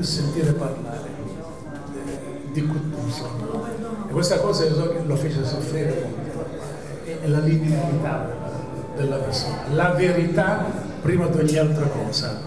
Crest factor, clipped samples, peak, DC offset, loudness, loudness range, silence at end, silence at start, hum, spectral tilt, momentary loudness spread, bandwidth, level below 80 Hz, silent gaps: 16 dB; under 0.1%; -6 dBFS; 0.8%; -24 LUFS; 6 LU; 0 s; 0 s; none; -6 dB/octave; 13 LU; 11 kHz; -48 dBFS; none